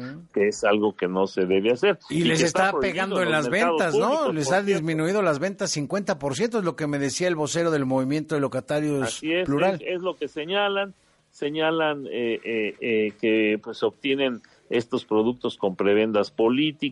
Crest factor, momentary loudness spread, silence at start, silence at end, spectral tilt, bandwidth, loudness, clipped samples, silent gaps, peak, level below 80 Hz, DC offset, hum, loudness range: 16 dB; 6 LU; 0 s; 0 s; -4.5 dB/octave; 11.5 kHz; -24 LUFS; under 0.1%; none; -8 dBFS; -62 dBFS; under 0.1%; none; 4 LU